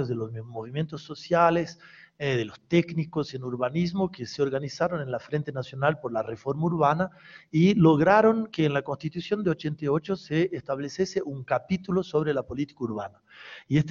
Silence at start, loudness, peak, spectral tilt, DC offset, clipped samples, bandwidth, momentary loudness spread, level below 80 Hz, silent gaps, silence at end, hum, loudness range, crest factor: 0 s; -27 LUFS; -6 dBFS; -7 dB/octave; under 0.1%; under 0.1%; 7.2 kHz; 12 LU; -60 dBFS; none; 0 s; none; 5 LU; 20 dB